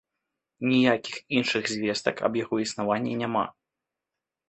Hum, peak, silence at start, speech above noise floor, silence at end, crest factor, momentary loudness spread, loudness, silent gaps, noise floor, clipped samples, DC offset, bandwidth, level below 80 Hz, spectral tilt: none; -6 dBFS; 0.6 s; 62 dB; 1 s; 22 dB; 7 LU; -26 LUFS; none; -88 dBFS; under 0.1%; under 0.1%; 8.6 kHz; -68 dBFS; -4.5 dB/octave